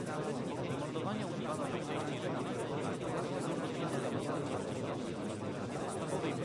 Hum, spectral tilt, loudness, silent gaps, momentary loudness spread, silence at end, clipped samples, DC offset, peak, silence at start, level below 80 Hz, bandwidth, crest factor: none; -6 dB/octave; -38 LUFS; none; 3 LU; 0 s; under 0.1%; under 0.1%; -24 dBFS; 0 s; -68 dBFS; 11.5 kHz; 12 dB